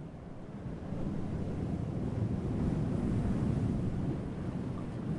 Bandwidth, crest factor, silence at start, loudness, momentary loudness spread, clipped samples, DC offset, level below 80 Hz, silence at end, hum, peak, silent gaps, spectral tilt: 11 kHz; 14 dB; 0 s; -35 LUFS; 10 LU; under 0.1%; under 0.1%; -44 dBFS; 0 s; none; -20 dBFS; none; -9 dB/octave